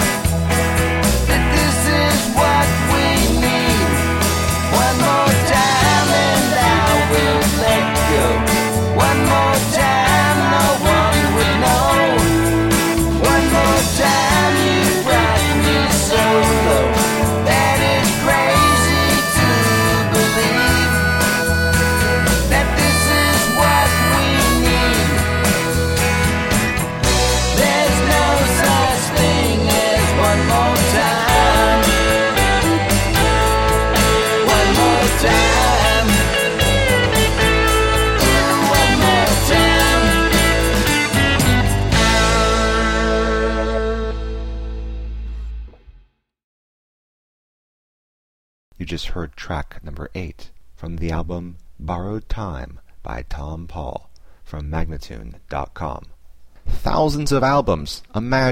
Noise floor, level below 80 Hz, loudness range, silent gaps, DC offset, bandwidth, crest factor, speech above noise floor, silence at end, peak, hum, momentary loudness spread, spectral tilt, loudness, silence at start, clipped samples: -52 dBFS; -24 dBFS; 16 LU; 46.44-48.72 s; under 0.1%; 16.5 kHz; 14 dB; 29 dB; 0 s; -2 dBFS; none; 15 LU; -4 dB/octave; -15 LUFS; 0 s; under 0.1%